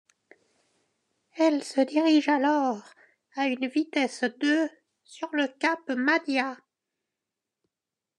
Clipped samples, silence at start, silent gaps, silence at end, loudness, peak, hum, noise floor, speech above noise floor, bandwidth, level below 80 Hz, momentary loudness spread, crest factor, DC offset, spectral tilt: under 0.1%; 1.35 s; none; 1.65 s; -26 LUFS; -10 dBFS; none; -89 dBFS; 63 dB; 10.5 kHz; under -90 dBFS; 11 LU; 18 dB; under 0.1%; -3 dB/octave